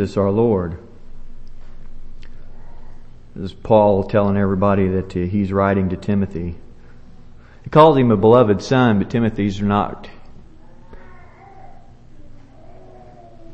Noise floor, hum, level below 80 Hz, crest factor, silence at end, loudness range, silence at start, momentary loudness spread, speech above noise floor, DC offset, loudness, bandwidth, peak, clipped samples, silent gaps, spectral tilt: -40 dBFS; none; -38 dBFS; 20 dB; 0 s; 10 LU; 0 s; 19 LU; 24 dB; under 0.1%; -17 LUFS; 8.2 kHz; 0 dBFS; under 0.1%; none; -8 dB/octave